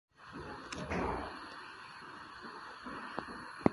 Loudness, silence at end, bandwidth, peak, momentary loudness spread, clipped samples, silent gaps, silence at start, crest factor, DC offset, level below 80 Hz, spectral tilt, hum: -43 LUFS; 0 s; 11.5 kHz; -8 dBFS; 12 LU; under 0.1%; none; 0.15 s; 32 dB; under 0.1%; -56 dBFS; -6 dB/octave; none